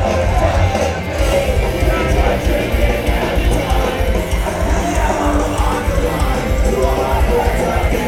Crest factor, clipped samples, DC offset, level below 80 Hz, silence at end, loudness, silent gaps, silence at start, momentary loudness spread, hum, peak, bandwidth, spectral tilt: 14 dB; under 0.1%; under 0.1%; -18 dBFS; 0 s; -16 LUFS; none; 0 s; 3 LU; none; -2 dBFS; 16 kHz; -5.5 dB/octave